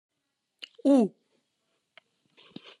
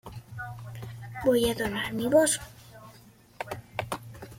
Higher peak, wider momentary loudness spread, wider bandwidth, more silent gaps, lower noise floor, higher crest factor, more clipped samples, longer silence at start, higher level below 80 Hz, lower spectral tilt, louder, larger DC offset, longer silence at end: about the same, -12 dBFS vs -10 dBFS; first, 26 LU vs 22 LU; second, 10.5 kHz vs 16.5 kHz; neither; first, -82 dBFS vs -55 dBFS; about the same, 18 dB vs 20 dB; neither; first, 0.85 s vs 0.05 s; second, under -90 dBFS vs -54 dBFS; first, -7 dB/octave vs -4 dB/octave; first, -25 LUFS vs -28 LUFS; neither; first, 1.7 s vs 0 s